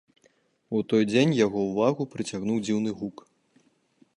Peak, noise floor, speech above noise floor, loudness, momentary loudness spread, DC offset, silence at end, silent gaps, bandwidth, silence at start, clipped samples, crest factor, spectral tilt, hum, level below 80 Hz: -8 dBFS; -65 dBFS; 40 dB; -26 LUFS; 10 LU; under 0.1%; 1.05 s; none; 10.5 kHz; 0.7 s; under 0.1%; 18 dB; -6 dB/octave; none; -66 dBFS